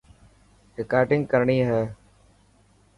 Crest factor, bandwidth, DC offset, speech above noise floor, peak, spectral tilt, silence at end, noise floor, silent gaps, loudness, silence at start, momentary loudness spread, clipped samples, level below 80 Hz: 20 dB; 11 kHz; under 0.1%; 37 dB; -6 dBFS; -8.5 dB/octave; 1.05 s; -59 dBFS; none; -23 LUFS; 0.8 s; 14 LU; under 0.1%; -56 dBFS